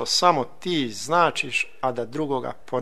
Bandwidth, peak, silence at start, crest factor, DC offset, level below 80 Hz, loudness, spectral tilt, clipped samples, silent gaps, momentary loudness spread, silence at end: 13.5 kHz; -2 dBFS; 0 s; 22 dB; 1%; -62 dBFS; -24 LUFS; -3.5 dB/octave; under 0.1%; none; 9 LU; 0 s